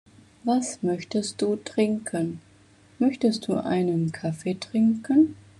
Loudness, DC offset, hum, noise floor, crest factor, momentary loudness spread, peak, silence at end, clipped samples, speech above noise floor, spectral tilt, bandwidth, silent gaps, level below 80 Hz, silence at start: -25 LUFS; under 0.1%; none; -55 dBFS; 16 dB; 8 LU; -10 dBFS; 0.25 s; under 0.1%; 31 dB; -6 dB/octave; 11.5 kHz; none; -66 dBFS; 0.45 s